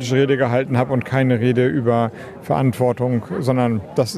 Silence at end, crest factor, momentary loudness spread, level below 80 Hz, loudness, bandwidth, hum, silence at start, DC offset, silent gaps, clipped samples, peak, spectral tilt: 0 s; 16 dB; 4 LU; -54 dBFS; -19 LUFS; 13.5 kHz; none; 0 s; under 0.1%; none; under 0.1%; -2 dBFS; -7 dB/octave